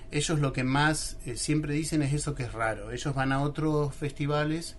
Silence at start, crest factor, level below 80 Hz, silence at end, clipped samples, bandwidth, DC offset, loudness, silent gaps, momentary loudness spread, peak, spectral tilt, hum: 0 s; 16 dB; -44 dBFS; 0 s; under 0.1%; 11.5 kHz; under 0.1%; -29 LUFS; none; 7 LU; -14 dBFS; -5 dB/octave; none